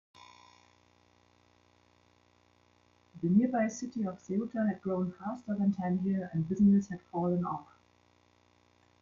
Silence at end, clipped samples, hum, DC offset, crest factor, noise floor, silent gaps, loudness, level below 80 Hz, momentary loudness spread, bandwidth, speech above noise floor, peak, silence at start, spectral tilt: 1.4 s; under 0.1%; 60 Hz at -55 dBFS; under 0.1%; 18 dB; -67 dBFS; none; -32 LUFS; -70 dBFS; 11 LU; 7.4 kHz; 36 dB; -16 dBFS; 3.15 s; -8 dB/octave